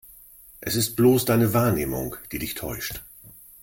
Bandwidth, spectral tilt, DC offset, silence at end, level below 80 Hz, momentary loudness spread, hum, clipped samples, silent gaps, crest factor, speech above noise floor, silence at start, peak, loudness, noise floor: 17 kHz; -5.5 dB/octave; under 0.1%; 0.3 s; -48 dBFS; 14 LU; none; under 0.1%; none; 18 dB; 26 dB; 0.6 s; -6 dBFS; -23 LUFS; -49 dBFS